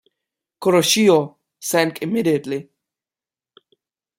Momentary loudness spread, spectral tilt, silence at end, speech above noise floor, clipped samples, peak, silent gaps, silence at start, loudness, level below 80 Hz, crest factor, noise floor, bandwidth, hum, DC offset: 15 LU; -4 dB/octave; 1.55 s; over 72 dB; under 0.1%; -2 dBFS; none; 0.6 s; -18 LUFS; -66 dBFS; 20 dB; under -90 dBFS; 16.5 kHz; none; under 0.1%